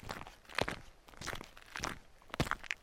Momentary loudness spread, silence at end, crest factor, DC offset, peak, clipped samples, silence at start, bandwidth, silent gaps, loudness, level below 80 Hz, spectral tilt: 11 LU; 0 s; 30 dB; under 0.1%; -12 dBFS; under 0.1%; 0 s; 16.5 kHz; none; -41 LUFS; -54 dBFS; -3.5 dB/octave